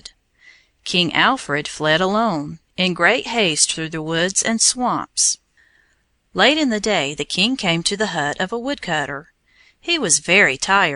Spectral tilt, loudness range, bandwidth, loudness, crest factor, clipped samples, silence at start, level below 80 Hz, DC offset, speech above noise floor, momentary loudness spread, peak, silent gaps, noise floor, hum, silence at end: -2 dB/octave; 2 LU; 11.5 kHz; -18 LUFS; 18 dB; under 0.1%; 0.85 s; -54 dBFS; under 0.1%; 44 dB; 10 LU; -2 dBFS; none; -63 dBFS; none; 0 s